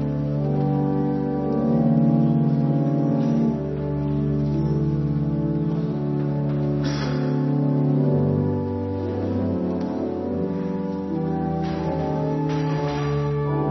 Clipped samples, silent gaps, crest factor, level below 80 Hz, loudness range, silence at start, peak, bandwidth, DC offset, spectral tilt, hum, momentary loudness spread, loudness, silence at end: under 0.1%; none; 14 dB; -42 dBFS; 4 LU; 0 s; -8 dBFS; 6.2 kHz; under 0.1%; -9.5 dB/octave; none; 6 LU; -23 LUFS; 0 s